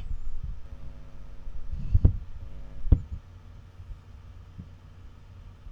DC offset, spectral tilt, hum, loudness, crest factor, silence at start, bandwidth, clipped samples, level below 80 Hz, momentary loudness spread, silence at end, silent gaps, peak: under 0.1%; -10 dB/octave; none; -30 LUFS; 22 dB; 0 s; 3.7 kHz; under 0.1%; -32 dBFS; 23 LU; 0 s; none; -8 dBFS